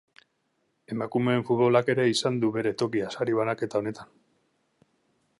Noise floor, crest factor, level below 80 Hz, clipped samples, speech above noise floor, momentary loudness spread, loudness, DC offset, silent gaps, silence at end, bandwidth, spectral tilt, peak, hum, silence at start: -74 dBFS; 20 dB; -68 dBFS; under 0.1%; 48 dB; 11 LU; -26 LUFS; under 0.1%; none; 1.35 s; 11.5 kHz; -5.5 dB/octave; -8 dBFS; none; 0.9 s